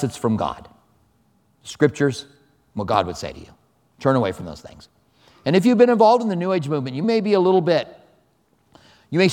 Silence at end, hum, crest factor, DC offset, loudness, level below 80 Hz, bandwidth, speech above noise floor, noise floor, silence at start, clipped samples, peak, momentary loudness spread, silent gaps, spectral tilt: 0 s; none; 20 dB; under 0.1%; -19 LUFS; -56 dBFS; 15 kHz; 43 dB; -63 dBFS; 0 s; under 0.1%; -2 dBFS; 20 LU; none; -6.5 dB/octave